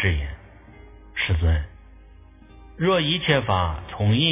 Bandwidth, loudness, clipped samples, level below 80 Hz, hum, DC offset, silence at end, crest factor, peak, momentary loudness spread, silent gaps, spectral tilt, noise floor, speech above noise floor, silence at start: 3.8 kHz; -23 LUFS; under 0.1%; -32 dBFS; none; under 0.1%; 0 s; 18 dB; -4 dBFS; 14 LU; none; -10 dB/octave; -47 dBFS; 27 dB; 0 s